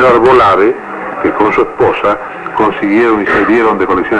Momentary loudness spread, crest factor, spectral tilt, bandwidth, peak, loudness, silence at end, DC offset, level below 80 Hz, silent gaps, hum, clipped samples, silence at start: 10 LU; 8 dB; -6.5 dB/octave; 9.8 kHz; 0 dBFS; -10 LUFS; 0 s; under 0.1%; -38 dBFS; none; none; under 0.1%; 0 s